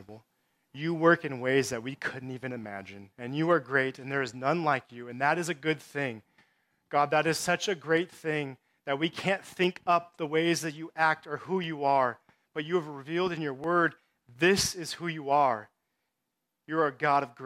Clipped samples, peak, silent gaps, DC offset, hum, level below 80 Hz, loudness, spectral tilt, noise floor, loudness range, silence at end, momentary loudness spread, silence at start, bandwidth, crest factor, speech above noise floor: under 0.1%; -8 dBFS; none; under 0.1%; none; -68 dBFS; -29 LUFS; -4.5 dB/octave; -84 dBFS; 2 LU; 0 s; 12 LU; 0 s; 16 kHz; 22 dB; 54 dB